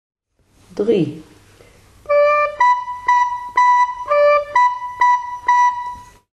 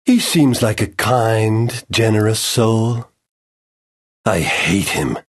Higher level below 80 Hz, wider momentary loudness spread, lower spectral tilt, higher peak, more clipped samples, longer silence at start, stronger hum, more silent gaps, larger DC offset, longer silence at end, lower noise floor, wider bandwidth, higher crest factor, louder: second, -54 dBFS vs -44 dBFS; first, 10 LU vs 5 LU; about the same, -5 dB/octave vs -5 dB/octave; second, -4 dBFS vs 0 dBFS; neither; first, 0.75 s vs 0.05 s; neither; second, none vs 3.31-4.24 s; neither; first, 0.3 s vs 0.1 s; second, -55 dBFS vs under -90 dBFS; second, 8.8 kHz vs 13 kHz; about the same, 14 dB vs 16 dB; about the same, -16 LUFS vs -16 LUFS